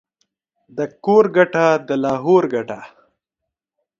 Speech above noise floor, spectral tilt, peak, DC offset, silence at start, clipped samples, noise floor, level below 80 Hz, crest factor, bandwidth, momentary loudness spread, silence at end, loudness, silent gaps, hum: 66 dB; -7 dB/octave; 0 dBFS; under 0.1%; 0.75 s; under 0.1%; -82 dBFS; -66 dBFS; 18 dB; 7.4 kHz; 15 LU; 1.15 s; -17 LUFS; none; none